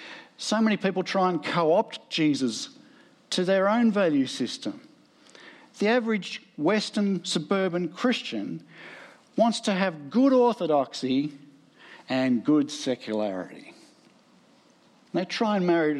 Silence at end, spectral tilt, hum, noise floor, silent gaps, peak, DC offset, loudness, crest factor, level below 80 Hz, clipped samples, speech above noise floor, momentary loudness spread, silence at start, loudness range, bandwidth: 0 s; -5 dB/octave; none; -59 dBFS; none; -10 dBFS; under 0.1%; -26 LUFS; 16 dB; -82 dBFS; under 0.1%; 34 dB; 14 LU; 0 s; 4 LU; 12 kHz